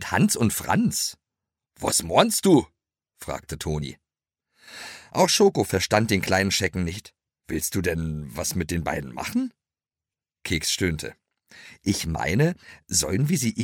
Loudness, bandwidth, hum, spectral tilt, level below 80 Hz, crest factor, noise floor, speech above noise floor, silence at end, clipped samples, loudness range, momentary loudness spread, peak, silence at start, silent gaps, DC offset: -24 LUFS; 17 kHz; none; -4 dB/octave; -46 dBFS; 22 dB; under -90 dBFS; over 66 dB; 0 s; under 0.1%; 6 LU; 16 LU; -4 dBFS; 0 s; none; under 0.1%